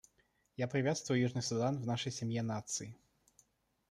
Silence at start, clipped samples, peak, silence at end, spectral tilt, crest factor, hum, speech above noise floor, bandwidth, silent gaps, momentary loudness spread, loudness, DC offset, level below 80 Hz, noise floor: 0.6 s; under 0.1%; -20 dBFS; 0.95 s; -5 dB/octave; 18 dB; none; 40 dB; 13 kHz; none; 8 LU; -37 LUFS; under 0.1%; -72 dBFS; -76 dBFS